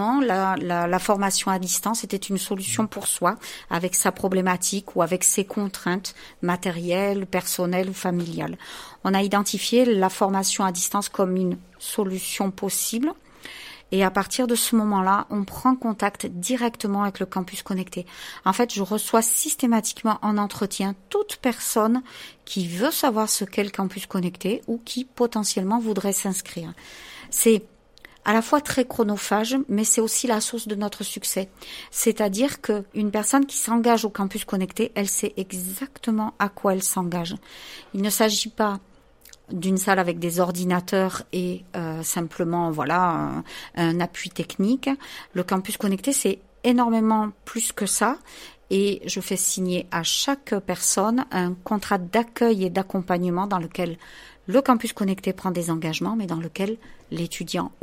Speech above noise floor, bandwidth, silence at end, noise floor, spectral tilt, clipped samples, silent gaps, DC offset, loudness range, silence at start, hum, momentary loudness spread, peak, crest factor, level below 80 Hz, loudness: 27 dB; 16 kHz; 0.1 s; -51 dBFS; -4 dB/octave; under 0.1%; none; under 0.1%; 3 LU; 0 s; none; 10 LU; -4 dBFS; 20 dB; -58 dBFS; -24 LUFS